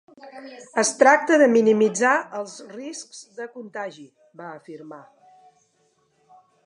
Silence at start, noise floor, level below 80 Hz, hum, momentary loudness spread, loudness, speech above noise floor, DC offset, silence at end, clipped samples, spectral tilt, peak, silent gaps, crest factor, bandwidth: 0.25 s; -66 dBFS; -82 dBFS; none; 25 LU; -18 LUFS; 44 dB; under 0.1%; 1.7 s; under 0.1%; -3.5 dB/octave; -2 dBFS; none; 22 dB; 11.5 kHz